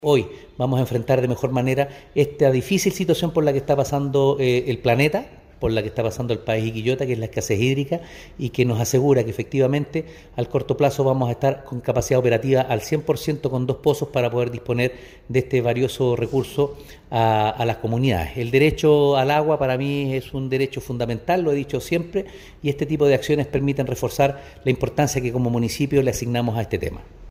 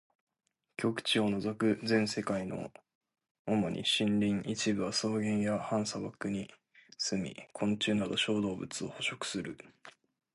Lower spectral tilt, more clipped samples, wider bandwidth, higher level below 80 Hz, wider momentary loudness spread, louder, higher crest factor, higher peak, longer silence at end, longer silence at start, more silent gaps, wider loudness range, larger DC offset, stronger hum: first, -6 dB/octave vs -4.5 dB/octave; neither; first, 16 kHz vs 11.5 kHz; first, -44 dBFS vs -66 dBFS; second, 8 LU vs 11 LU; first, -21 LUFS vs -33 LUFS; about the same, 16 dB vs 16 dB; first, -4 dBFS vs -18 dBFS; second, 0 s vs 0.45 s; second, 0 s vs 0.8 s; second, none vs 2.95-3.01 s, 3.31-3.45 s; about the same, 3 LU vs 2 LU; neither; neither